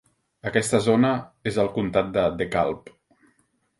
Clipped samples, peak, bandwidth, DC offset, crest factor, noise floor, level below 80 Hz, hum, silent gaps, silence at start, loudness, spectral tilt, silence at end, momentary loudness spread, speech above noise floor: under 0.1%; -4 dBFS; 12 kHz; under 0.1%; 22 dB; -67 dBFS; -52 dBFS; none; none; 0.45 s; -23 LUFS; -5.5 dB/octave; 1 s; 8 LU; 45 dB